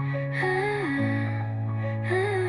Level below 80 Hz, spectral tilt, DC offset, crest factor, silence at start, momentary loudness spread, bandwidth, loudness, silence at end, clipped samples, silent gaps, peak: -58 dBFS; -7.5 dB/octave; under 0.1%; 14 dB; 0 s; 4 LU; 11 kHz; -27 LUFS; 0 s; under 0.1%; none; -12 dBFS